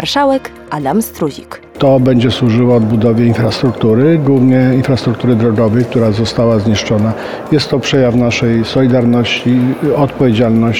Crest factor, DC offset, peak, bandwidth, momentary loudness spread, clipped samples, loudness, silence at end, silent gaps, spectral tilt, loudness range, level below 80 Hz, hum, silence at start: 10 dB; 0.7%; 0 dBFS; 16.5 kHz; 6 LU; under 0.1%; -12 LUFS; 0 s; none; -7 dB/octave; 2 LU; -40 dBFS; none; 0 s